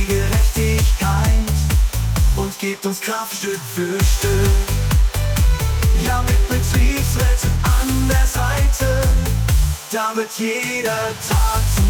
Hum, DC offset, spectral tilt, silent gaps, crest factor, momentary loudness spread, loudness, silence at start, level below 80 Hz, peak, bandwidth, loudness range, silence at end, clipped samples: none; under 0.1%; -5 dB/octave; none; 10 dB; 5 LU; -18 LUFS; 0 s; -18 dBFS; -6 dBFS; 19.5 kHz; 2 LU; 0 s; under 0.1%